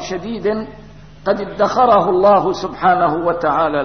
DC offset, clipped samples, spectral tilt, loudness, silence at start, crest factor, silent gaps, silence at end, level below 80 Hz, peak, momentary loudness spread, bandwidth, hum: 0.6%; under 0.1%; -6 dB/octave; -16 LUFS; 0 s; 14 dB; none; 0 s; -46 dBFS; -2 dBFS; 12 LU; 6.6 kHz; none